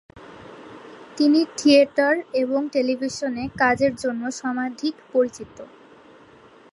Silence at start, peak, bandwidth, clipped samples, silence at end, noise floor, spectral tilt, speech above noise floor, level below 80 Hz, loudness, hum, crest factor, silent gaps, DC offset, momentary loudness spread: 0.15 s; -4 dBFS; 11.5 kHz; under 0.1%; 1.1 s; -50 dBFS; -4 dB/octave; 29 dB; -58 dBFS; -21 LUFS; none; 18 dB; none; under 0.1%; 25 LU